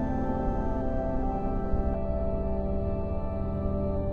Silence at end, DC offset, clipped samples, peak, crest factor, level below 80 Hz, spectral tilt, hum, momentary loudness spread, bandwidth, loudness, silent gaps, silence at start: 0 s; under 0.1%; under 0.1%; -14 dBFS; 14 dB; -32 dBFS; -11 dB/octave; none; 2 LU; 4.4 kHz; -31 LUFS; none; 0 s